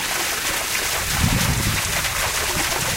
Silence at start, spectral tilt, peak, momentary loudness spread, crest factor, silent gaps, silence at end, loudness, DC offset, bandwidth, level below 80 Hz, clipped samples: 0 s; -2 dB/octave; -4 dBFS; 2 LU; 16 dB; none; 0 s; -20 LUFS; under 0.1%; 16 kHz; -32 dBFS; under 0.1%